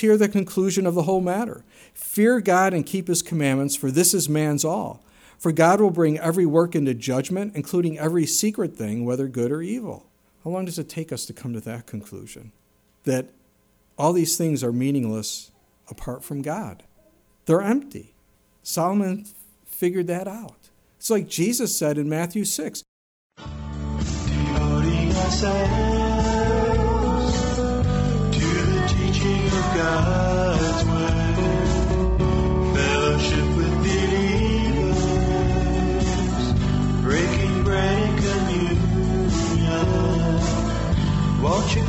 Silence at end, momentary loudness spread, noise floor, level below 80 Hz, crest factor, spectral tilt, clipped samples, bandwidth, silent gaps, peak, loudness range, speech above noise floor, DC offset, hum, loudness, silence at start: 0 s; 12 LU; -61 dBFS; -30 dBFS; 18 dB; -5.5 dB/octave; under 0.1%; over 20 kHz; 22.88-23.30 s; -4 dBFS; 7 LU; 39 dB; under 0.1%; none; -22 LUFS; 0 s